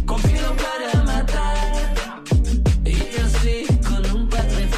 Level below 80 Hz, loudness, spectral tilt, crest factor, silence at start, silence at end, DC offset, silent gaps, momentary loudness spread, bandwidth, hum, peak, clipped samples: -20 dBFS; -21 LUFS; -5.5 dB/octave; 12 dB; 0 s; 0 s; under 0.1%; none; 4 LU; 14.5 kHz; none; -6 dBFS; under 0.1%